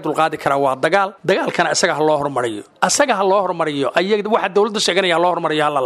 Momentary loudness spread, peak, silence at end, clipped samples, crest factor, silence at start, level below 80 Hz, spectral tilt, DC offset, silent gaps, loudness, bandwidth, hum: 4 LU; 0 dBFS; 0 s; under 0.1%; 16 dB; 0 s; -62 dBFS; -3 dB/octave; under 0.1%; none; -17 LUFS; 14.5 kHz; none